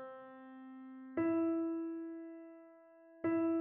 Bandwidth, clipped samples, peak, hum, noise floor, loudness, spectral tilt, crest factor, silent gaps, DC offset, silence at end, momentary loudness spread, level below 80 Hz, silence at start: 3.2 kHz; under 0.1%; -24 dBFS; none; -61 dBFS; -38 LUFS; -8 dB/octave; 14 dB; none; under 0.1%; 0 s; 19 LU; -84 dBFS; 0 s